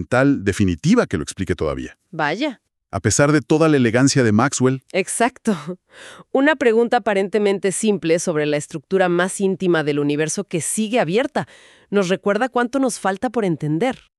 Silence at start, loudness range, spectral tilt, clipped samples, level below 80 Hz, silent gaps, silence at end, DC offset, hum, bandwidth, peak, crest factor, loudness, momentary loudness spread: 0 s; 3 LU; -5 dB/octave; under 0.1%; -48 dBFS; none; 0.25 s; under 0.1%; none; 13.5 kHz; -2 dBFS; 16 dB; -19 LUFS; 9 LU